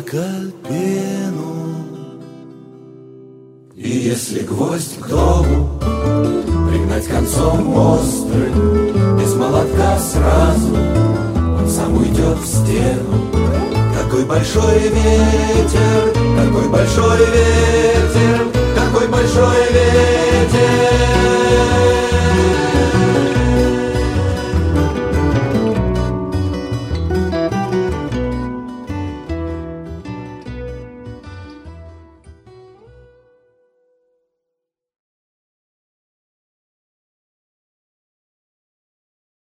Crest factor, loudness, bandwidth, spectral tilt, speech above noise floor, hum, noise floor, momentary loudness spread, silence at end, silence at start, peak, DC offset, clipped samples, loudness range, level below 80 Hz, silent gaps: 14 dB; -15 LUFS; 16 kHz; -6 dB/octave; 66 dB; none; -79 dBFS; 14 LU; 7.2 s; 0 s; 0 dBFS; under 0.1%; under 0.1%; 12 LU; -24 dBFS; none